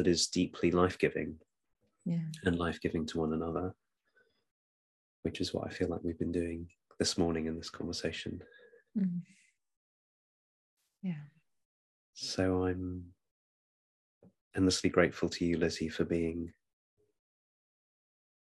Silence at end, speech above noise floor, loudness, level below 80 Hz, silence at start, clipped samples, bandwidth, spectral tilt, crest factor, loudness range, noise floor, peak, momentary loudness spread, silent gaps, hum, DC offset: 2 s; 40 dB; -34 LUFS; -64 dBFS; 0 s; under 0.1%; 12.5 kHz; -5 dB/octave; 24 dB; 8 LU; -73 dBFS; -12 dBFS; 13 LU; 4.51-5.23 s, 9.76-10.77 s, 11.65-12.13 s, 13.31-14.21 s, 14.41-14.51 s; none; under 0.1%